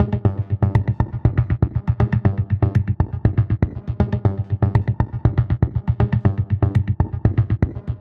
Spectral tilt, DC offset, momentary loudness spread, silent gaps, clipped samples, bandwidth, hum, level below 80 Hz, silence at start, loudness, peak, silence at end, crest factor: -11 dB/octave; under 0.1%; 3 LU; none; under 0.1%; 4.3 kHz; none; -30 dBFS; 0 s; -20 LUFS; -2 dBFS; 0 s; 18 dB